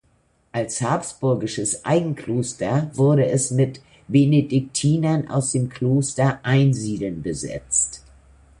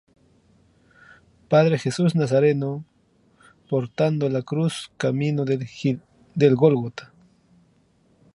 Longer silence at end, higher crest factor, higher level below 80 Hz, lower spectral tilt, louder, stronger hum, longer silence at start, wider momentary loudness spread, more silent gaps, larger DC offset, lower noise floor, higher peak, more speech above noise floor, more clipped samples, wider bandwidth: second, 0.6 s vs 1.3 s; about the same, 16 dB vs 20 dB; first, -52 dBFS vs -64 dBFS; second, -5.5 dB/octave vs -7 dB/octave; about the same, -21 LUFS vs -22 LUFS; neither; second, 0.55 s vs 1.5 s; about the same, 9 LU vs 11 LU; neither; neither; about the same, -62 dBFS vs -61 dBFS; about the same, -4 dBFS vs -2 dBFS; about the same, 42 dB vs 40 dB; neither; about the same, 11.5 kHz vs 11.5 kHz